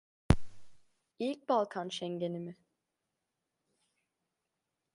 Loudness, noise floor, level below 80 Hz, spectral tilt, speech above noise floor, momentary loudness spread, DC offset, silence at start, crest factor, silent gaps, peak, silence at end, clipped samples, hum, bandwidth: -35 LUFS; -87 dBFS; -48 dBFS; -6.5 dB/octave; 51 dB; 8 LU; under 0.1%; 0.3 s; 30 dB; none; -6 dBFS; 2.4 s; under 0.1%; none; 11.5 kHz